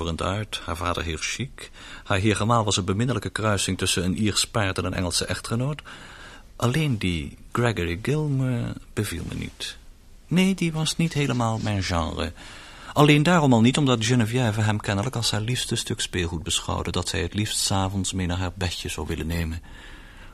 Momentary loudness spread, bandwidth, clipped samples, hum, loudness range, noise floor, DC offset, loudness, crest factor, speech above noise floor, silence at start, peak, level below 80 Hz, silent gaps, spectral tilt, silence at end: 12 LU; 15 kHz; under 0.1%; none; 5 LU; -47 dBFS; under 0.1%; -24 LUFS; 22 dB; 23 dB; 0 s; -2 dBFS; -42 dBFS; none; -4.5 dB/octave; 0 s